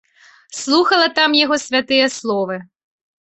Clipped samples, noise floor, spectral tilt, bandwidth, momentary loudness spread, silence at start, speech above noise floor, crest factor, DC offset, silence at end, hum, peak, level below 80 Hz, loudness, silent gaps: under 0.1%; -46 dBFS; -2.5 dB/octave; 8.4 kHz; 14 LU; 0.5 s; 29 dB; 16 dB; under 0.1%; 0.6 s; none; -2 dBFS; -62 dBFS; -15 LUFS; none